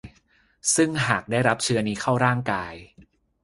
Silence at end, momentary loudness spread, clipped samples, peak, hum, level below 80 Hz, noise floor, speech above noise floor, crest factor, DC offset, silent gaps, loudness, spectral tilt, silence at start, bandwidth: 0.55 s; 8 LU; under 0.1%; -2 dBFS; none; -54 dBFS; -62 dBFS; 39 dB; 22 dB; under 0.1%; none; -23 LUFS; -4 dB/octave; 0.05 s; 11.5 kHz